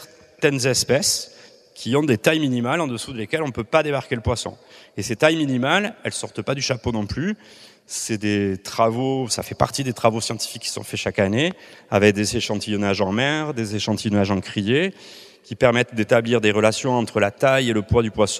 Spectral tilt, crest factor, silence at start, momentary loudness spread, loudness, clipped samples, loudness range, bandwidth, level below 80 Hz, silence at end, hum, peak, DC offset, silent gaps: -4.5 dB/octave; 22 dB; 0 s; 9 LU; -21 LUFS; under 0.1%; 4 LU; 14.5 kHz; -48 dBFS; 0 s; none; 0 dBFS; under 0.1%; none